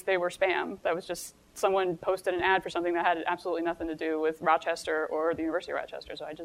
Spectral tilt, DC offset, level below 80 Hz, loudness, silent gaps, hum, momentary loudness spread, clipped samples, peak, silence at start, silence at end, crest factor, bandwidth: -4 dB/octave; under 0.1%; -62 dBFS; -29 LUFS; none; none; 9 LU; under 0.1%; -10 dBFS; 0.05 s; 0 s; 20 dB; 16 kHz